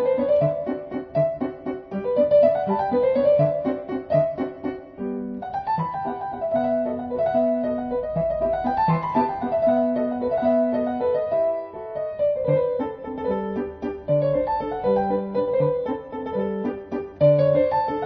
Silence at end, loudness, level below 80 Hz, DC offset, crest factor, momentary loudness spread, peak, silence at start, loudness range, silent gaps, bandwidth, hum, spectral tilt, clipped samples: 0 s; -23 LUFS; -50 dBFS; under 0.1%; 16 dB; 11 LU; -6 dBFS; 0 s; 4 LU; none; 5.2 kHz; none; -10.5 dB/octave; under 0.1%